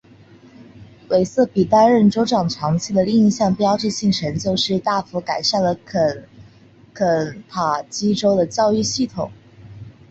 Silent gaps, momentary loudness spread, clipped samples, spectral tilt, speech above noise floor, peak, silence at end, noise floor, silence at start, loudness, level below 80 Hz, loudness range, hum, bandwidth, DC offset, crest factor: none; 8 LU; under 0.1%; -5.5 dB/octave; 30 dB; -2 dBFS; 0.2 s; -48 dBFS; 0.6 s; -18 LUFS; -52 dBFS; 4 LU; none; 8 kHz; under 0.1%; 16 dB